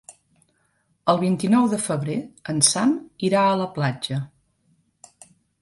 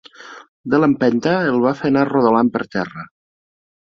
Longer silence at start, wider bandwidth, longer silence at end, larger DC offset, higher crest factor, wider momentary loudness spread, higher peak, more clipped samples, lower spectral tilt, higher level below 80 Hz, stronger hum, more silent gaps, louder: about the same, 0.1 s vs 0.2 s; first, 11.5 kHz vs 6.8 kHz; first, 1.35 s vs 0.9 s; neither; first, 22 dB vs 16 dB; second, 11 LU vs 16 LU; about the same, -2 dBFS vs -2 dBFS; neither; second, -4.5 dB/octave vs -7.5 dB/octave; second, -64 dBFS vs -58 dBFS; neither; second, none vs 0.48-0.64 s; second, -22 LUFS vs -17 LUFS